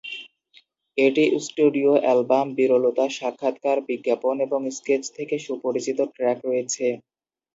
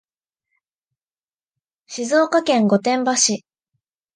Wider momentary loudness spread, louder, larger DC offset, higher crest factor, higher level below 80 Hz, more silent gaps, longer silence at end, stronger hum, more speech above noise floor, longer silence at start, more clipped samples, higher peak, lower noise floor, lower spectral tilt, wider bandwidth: second, 9 LU vs 12 LU; second, -23 LUFS vs -17 LUFS; neither; about the same, 18 dB vs 18 dB; about the same, -76 dBFS vs -74 dBFS; neither; second, 0.55 s vs 0.8 s; neither; second, 36 dB vs over 73 dB; second, 0.05 s vs 1.9 s; neither; about the same, -6 dBFS vs -4 dBFS; second, -58 dBFS vs under -90 dBFS; about the same, -4 dB/octave vs -3 dB/octave; second, 8 kHz vs 10.5 kHz